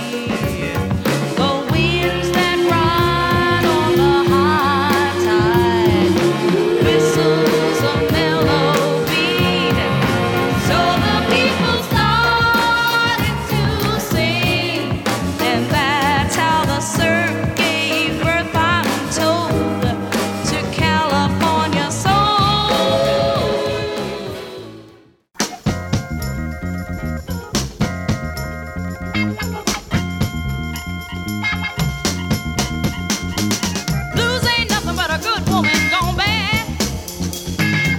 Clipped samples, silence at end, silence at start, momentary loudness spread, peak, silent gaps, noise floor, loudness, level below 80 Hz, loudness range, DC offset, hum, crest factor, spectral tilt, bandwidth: under 0.1%; 0 s; 0 s; 9 LU; -2 dBFS; none; -47 dBFS; -17 LUFS; -34 dBFS; 8 LU; under 0.1%; none; 16 dB; -4.5 dB/octave; 19 kHz